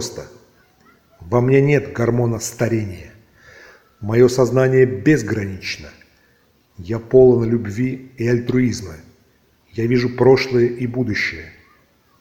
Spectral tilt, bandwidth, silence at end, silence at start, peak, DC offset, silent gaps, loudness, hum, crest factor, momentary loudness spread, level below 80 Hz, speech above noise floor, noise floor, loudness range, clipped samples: -6.5 dB/octave; 15.5 kHz; 0.7 s; 0 s; 0 dBFS; under 0.1%; none; -17 LUFS; none; 18 dB; 16 LU; -46 dBFS; 41 dB; -58 dBFS; 2 LU; under 0.1%